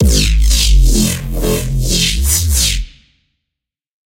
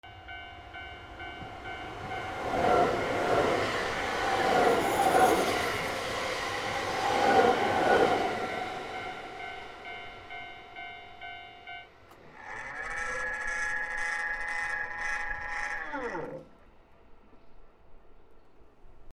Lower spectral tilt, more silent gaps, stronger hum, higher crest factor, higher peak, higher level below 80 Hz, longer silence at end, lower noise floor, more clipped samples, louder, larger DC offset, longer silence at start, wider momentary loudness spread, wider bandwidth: about the same, -3.5 dB/octave vs -3.5 dB/octave; neither; neither; second, 12 dB vs 22 dB; first, 0 dBFS vs -10 dBFS; first, -14 dBFS vs -54 dBFS; first, 1.25 s vs 0.05 s; first, -81 dBFS vs -56 dBFS; neither; first, -13 LUFS vs -29 LUFS; neither; about the same, 0 s vs 0.05 s; second, 6 LU vs 19 LU; about the same, 17 kHz vs 16 kHz